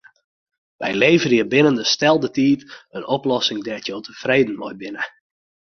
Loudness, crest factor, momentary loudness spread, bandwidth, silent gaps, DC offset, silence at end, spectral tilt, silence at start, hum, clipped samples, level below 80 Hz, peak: -19 LUFS; 18 dB; 14 LU; 6.8 kHz; none; under 0.1%; 0.7 s; -4.5 dB/octave; 0.8 s; none; under 0.1%; -60 dBFS; -2 dBFS